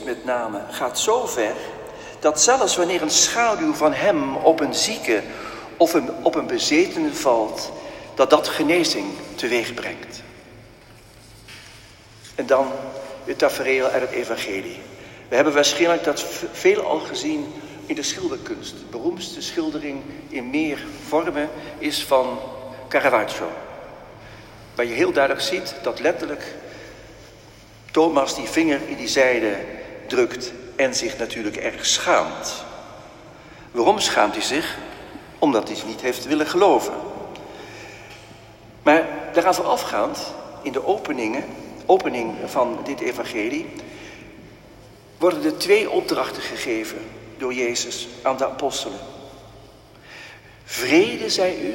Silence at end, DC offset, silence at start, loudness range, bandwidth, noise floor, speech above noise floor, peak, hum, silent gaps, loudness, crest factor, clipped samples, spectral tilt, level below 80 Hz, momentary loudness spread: 0 s; under 0.1%; 0 s; 7 LU; 16.5 kHz; -47 dBFS; 25 dB; 0 dBFS; none; none; -21 LUFS; 22 dB; under 0.1%; -2.5 dB/octave; -54 dBFS; 20 LU